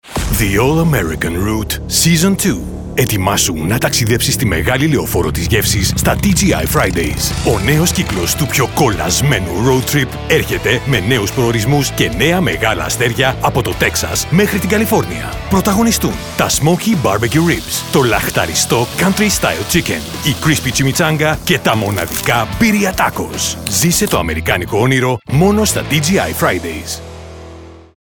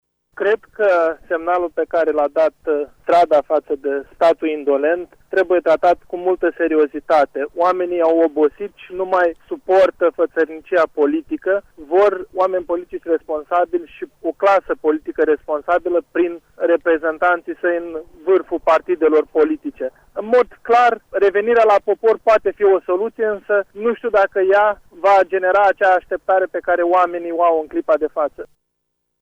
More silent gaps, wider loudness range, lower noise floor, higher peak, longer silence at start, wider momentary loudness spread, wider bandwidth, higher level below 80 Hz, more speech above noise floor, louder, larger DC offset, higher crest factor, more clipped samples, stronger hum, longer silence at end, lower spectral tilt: neither; about the same, 1 LU vs 3 LU; second, -34 dBFS vs -73 dBFS; first, 0 dBFS vs -4 dBFS; second, 0.05 s vs 0.35 s; second, 5 LU vs 8 LU; first, over 20 kHz vs 8.4 kHz; first, -30 dBFS vs -54 dBFS; second, 21 dB vs 56 dB; first, -14 LUFS vs -17 LUFS; first, 0.2% vs under 0.1%; about the same, 14 dB vs 14 dB; neither; neither; second, 0.25 s vs 0.75 s; second, -4 dB/octave vs -5.5 dB/octave